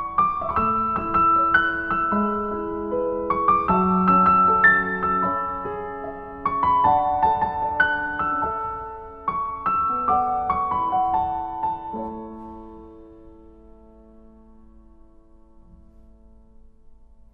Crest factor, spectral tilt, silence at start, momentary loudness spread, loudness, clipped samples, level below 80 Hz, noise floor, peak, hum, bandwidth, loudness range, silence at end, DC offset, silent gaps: 18 dB; -9 dB/octave; 0 s; 15 LU; -21 LUFS; under 0.1%; -46 dBFS; -50 dBFS; -4 dBFS; none; 4.9 kHz; 9 LU; 0.4 s; under 0.1%; none